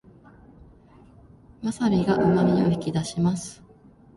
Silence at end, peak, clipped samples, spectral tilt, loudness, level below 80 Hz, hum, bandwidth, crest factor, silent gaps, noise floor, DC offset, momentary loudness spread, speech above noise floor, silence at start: 0.65 s; -8 dBFS; under 0.1%; -7 dB/octave; -23 LUFS; -52 dBFS; none; 11.5 kHz; 18 dB; none; -52 dBFS; under 0.1%; 12 LU; 30 dB; 1.6 s